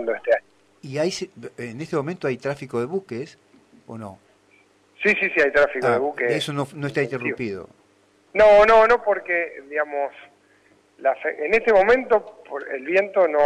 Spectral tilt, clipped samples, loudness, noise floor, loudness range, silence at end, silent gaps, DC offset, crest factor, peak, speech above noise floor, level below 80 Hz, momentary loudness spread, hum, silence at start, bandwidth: -5 dB/octave; under 0.1%; -21 LUFS; -59 dBFS; 10 LU; 0 s; none; under 0.1%; 14 dB; -8 dBFS; 38 dB; -52 dBFS; 18 LU; none; 0 s; 11 kHz